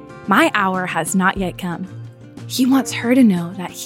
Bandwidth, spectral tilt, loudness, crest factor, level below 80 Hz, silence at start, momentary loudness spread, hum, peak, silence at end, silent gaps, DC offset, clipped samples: 17 kHz; -5 dB/octave; -17 LUFS; 16 dB; -48 dBFS; 0 s; 17 LU; none; -2 dBFS; 0 s; none; under 0.1%; under 0.1%